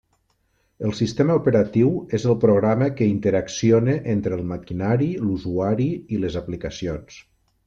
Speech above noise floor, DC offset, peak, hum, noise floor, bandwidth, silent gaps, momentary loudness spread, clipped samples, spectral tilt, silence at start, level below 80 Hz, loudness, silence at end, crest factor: 46 dB; under 0.1%; -6 dBFS; none; -67 dBFS; 7.6 kHz; none; 11 LU; under 0.1%; -7.5 dB/octave; 0.8 s; -50 dBFS; -21 LUFS; 0.45 s; 16 dB